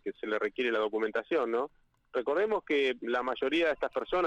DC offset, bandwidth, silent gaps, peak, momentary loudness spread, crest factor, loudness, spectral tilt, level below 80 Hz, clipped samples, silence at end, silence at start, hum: under 0.1%; 9 kHz; none; -20 dBFS; 6 LU; 12 dB; -31 LUFS; -4.5 dB/octave; -64 dBFS; under 0.1%; 0 s; 0.05 s; none